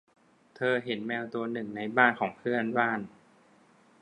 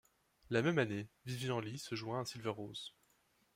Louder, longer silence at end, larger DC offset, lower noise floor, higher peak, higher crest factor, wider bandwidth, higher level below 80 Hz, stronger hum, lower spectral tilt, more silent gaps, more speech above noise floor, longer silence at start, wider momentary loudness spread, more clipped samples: first, -29 LUFS vs -40 LUFS; first, 0.95 s vs 0.65 s; neither; second, -61 dBFS vs -75 dBFS; first, -6 dBFS vs -20 dBFS; about the same, 24 dB vs 20 dB; second, 10 kHz vs 16 kHz; about the same, -76 dBFS vs -76 dBFS; neither; first, -7 dB/octave vs -5.5 dB/octave; neither; second, 32 dB vs 36 dB; about the same, 0.6 s vs 0.5 s; about the same, 11 LU vs 12 LU; neither